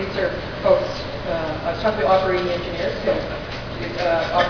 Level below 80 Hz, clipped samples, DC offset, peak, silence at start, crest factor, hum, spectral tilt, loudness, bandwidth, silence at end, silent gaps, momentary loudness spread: -38 dBFS; under 0.1%; under 0.1%; -4 dBFS; 0 s; 18 dB; none; -6 dB/octave; -22 LUFS; 5.4 kHz; 0 s; none; 10 LU